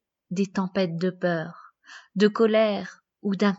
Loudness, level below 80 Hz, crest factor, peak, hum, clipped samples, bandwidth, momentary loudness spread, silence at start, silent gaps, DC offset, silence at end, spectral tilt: -25 LUFS; -74 dBFS; 18 dB; -6 dBFS; none; under 0.1%; 7.8 kHz; 14 LU; 0.3 s; none; under 0.1%; 0 s; -6.5 dB/octave